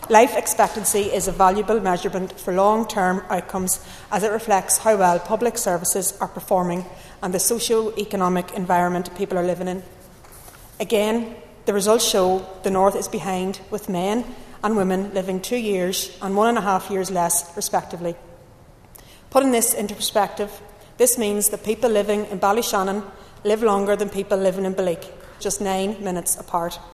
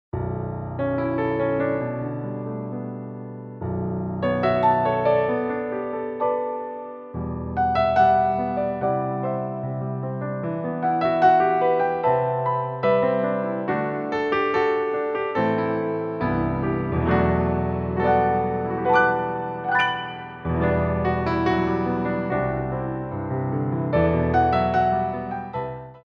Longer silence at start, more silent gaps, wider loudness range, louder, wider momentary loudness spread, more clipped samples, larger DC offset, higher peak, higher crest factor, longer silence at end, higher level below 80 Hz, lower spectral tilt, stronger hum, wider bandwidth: second, 0 s vs 0.15 s; neither; about the same, 3 LU vs 3 LU; about the same, -21 LUFS vs -23 LUFS; about the same, 10 LU vs 11 LU; neither; neither; first, 0 dBFS vs -6 dBFS; about the same, 22 dB vs 18 dB; about the same, 0 s vs 0.05 s; second, -48 dBFS vs -42 dBFS; second, -3.5 dB/octave vs -9 dB/octave; neither; first, 14 kHz vs 6.6 kHz